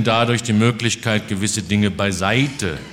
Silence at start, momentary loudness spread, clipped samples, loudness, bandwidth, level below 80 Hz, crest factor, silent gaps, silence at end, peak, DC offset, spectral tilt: 0 s; 4 LU; under 0.1%; -19 LUFS; 16 kHz; -46 dBFS; 18 dB; none; 0 s; -2 dBFS; under 0.1%; -4.5 dB/octave